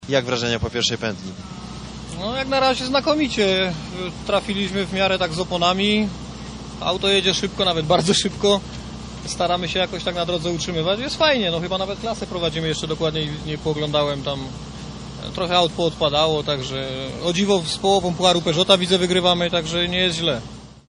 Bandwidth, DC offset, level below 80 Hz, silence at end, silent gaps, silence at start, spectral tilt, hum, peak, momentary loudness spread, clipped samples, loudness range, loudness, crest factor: 11 kHz; under 0.1%; -42 dBFS; 0.15 s; none; 0 s; -4 dB/octave; none; 0 dBFS; 15 LU; under 0.1%; 4 LU; -20 LUFS; 22 dB